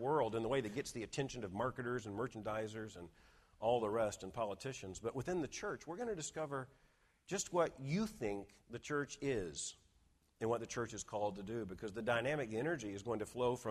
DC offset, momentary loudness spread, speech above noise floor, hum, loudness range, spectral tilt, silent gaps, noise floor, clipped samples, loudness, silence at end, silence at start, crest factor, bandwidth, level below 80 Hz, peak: under 0.1%; 9 LU; 32 dB; none; 2 LU; -5 dB/octave; none; -74 dBFS; under 0.1%; -41 LUFS; 0 s; 0 s; 20 dB; 14 kHz; -66 dBFS; -22 dBFS